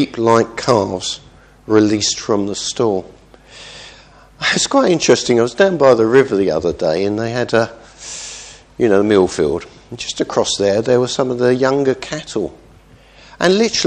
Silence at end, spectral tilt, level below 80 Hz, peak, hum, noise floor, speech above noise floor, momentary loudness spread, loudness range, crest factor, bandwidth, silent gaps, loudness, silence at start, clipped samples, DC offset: 0 s; -4 dB/octave; -48 dBFS; 0 dBFS; none; -45 dBFS; 30 dB; 16 LU; 4 LU; 16 dB; 10.5 kHz; none; -15 LUFS; 0 s; under 0.1%; under 0.1%